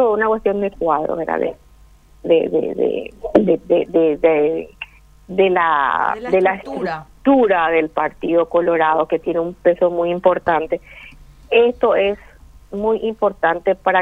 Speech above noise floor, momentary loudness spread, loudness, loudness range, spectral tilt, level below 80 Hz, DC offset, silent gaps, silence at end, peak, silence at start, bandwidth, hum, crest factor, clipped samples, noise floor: 30 dB; 10 LU; -17 LUFS; 2 LU; -7.5 dB/octave; -48 dBFS; under 0.1%; none; 0 s; 0 dBFS; 0 s; 5.2 kHz; none; 16 dB; under 0.1%; -47 dBFS